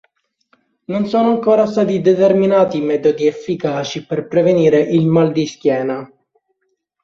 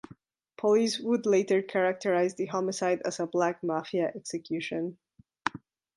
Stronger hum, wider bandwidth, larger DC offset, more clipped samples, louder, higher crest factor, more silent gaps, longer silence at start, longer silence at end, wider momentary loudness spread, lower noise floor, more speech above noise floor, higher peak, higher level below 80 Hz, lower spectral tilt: neither; second, 7.4 kHz vs 11.5 kHz; neither; neither; first, -15 LUFS vs -29 LUFS; second, 14 dB vs 22 dB; neither; first, 0.9 s vs 0.1 s; first, 1 s vs 0.4 s; about the same, 9 LU vs 10 LU; first, -69 dBFS vs -56 dBFS; first, 55 dB vs 28 dB; first, -2 dBFS vs -8 dBFS; first, -58 dBFS vs -76 dBFS; first, -7 dB/octave vs -4.5 dB/octave